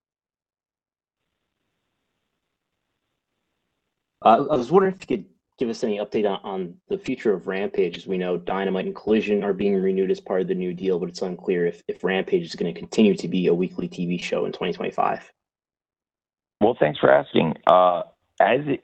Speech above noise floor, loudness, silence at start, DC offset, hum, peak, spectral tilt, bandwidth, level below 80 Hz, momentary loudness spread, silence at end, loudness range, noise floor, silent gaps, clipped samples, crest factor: over 68 dB; -23 LUFS; 4.2 s; under 0.1%; none; 0 dBFS; -6.5 dB/octave; 8.4 kHz; -62 dBFS; 11 LU; 0.05 s; 5 LU; under -90 dBFS; none; under 0.1%; 22 dB